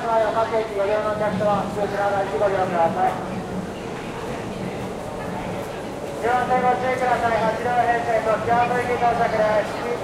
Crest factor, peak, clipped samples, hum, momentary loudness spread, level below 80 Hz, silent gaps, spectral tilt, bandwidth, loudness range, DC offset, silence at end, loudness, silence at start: 14 dB; -8 dBFS; under 0.1%; none; 10 LU; -46 dBFS; none; -5.5 dB/octave; 15 kHz; 6 LU; under 0.1%; 0 s; -22 LUFS; 0 s